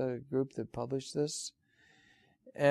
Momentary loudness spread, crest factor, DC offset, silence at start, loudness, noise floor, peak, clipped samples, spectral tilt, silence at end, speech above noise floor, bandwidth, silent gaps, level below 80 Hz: 8 LU; 20 dB; under 0.1%; 0 s; -36 LUFS; -67 dBFS; -16 dBFS; under 0.1%; -5 dB/octave; 0 s; 31 dB; 13.5 kHz; none; -70 dBFS